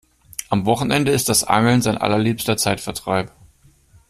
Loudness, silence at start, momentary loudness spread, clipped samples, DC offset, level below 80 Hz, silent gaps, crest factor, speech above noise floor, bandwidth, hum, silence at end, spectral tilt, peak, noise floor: -18 LUFS; 0.4 s; 9 LU; under 0.1%; under 0.1%; -48 dBFS; none; 18 dB; 34 dB; 16 kHz; none; 0.8 s; -4.5 dB/octave; -2 dBFS; -53 dBFS